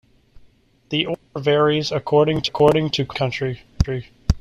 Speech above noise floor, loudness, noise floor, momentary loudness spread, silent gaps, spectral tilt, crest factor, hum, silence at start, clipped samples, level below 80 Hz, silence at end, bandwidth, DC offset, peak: 34 dB; -20 LUFS; -54 dBFS; 9 LU; none; -6 dB/octave; 18 dB; none; 0.9 s; under 0.1%; -34 dBFS; 0 s; 12.5 kHz; under 0.1%; -4 dBFS